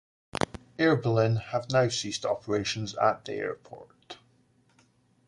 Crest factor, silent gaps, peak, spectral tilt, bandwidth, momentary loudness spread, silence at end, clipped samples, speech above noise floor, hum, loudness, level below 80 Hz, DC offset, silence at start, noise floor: 22 dB; none; -8 dBFS; -5 dB/octave; 11.5 kHz; 23 LU; 1.15 s; under 0.1%; 38 dB; none; -28 LUFS; -60 dBFS; under 0.1%; 0.4 s; -65 dBFS